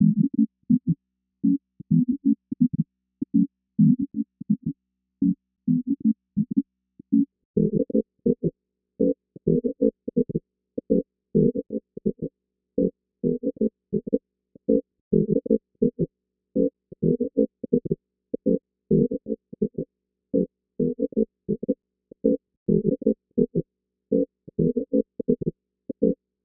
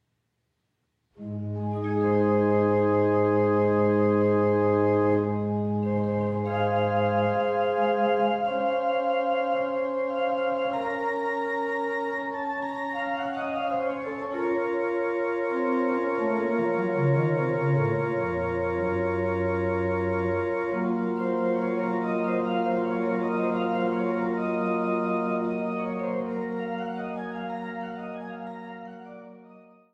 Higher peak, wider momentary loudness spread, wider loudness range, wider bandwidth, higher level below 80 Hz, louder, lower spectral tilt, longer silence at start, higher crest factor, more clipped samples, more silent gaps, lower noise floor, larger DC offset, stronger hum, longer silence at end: first, -6 dBFS vs -12 dBFS; about the same, 9 LU vs 9 LU; second, 3 LU vs 6 LU; second, 0.8 kHz vs 7.8 kHz; first, -54 dBFS vs -62 dBFS; about the same, -26 LUFS vs -26 LUFS; first, -20 dB/octave vs -9 dB/octave; second, 0 s vs 1.2 s; first, 20 dB vs 14 dB; neither; first, 7.45-7.54 s, 15.01-15.11 s, 22.57-22.66 s vs none; second, -65 dBFS vs -76 dBFS; neither; neither; about the same, 0.3 s vs 0.35 s